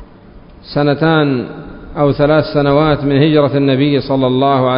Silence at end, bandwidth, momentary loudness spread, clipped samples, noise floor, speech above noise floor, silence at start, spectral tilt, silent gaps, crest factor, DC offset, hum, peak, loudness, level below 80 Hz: 0 s; 5.4 kHz; 9 LU; under 0.1%; -38 dBFS; 26 dB; 0 s; -12.5 dB/octave; none; 12 dB; under 0.1%; none; 0 dBFS; -13 LUFS; -38 dBFS